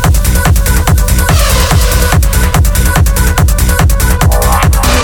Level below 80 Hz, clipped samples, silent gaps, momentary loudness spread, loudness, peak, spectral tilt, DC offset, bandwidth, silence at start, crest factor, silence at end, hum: -10 dBFS; under 0.1%; none; 1 LU; -9 LUFS; 0 dBFS; -4.5 dB/octave; under 0.1%; 20 kHz; 0 s; 8 dB; 0 s; none